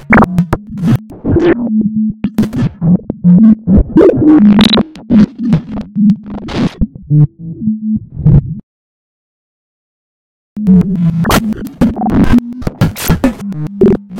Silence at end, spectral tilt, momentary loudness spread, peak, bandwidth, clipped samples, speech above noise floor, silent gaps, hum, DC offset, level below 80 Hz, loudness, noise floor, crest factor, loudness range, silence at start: 0 s; -7 dB/octave; 11 LU; 0 dBFS; 16.5 kHz; 0.6%; over 82 dB; 8.63-10.56 s; none; under 0.1%; -24 dBFS; -11 LUFS; under -90 dBFS; 10 dB; 7 LU; 0 s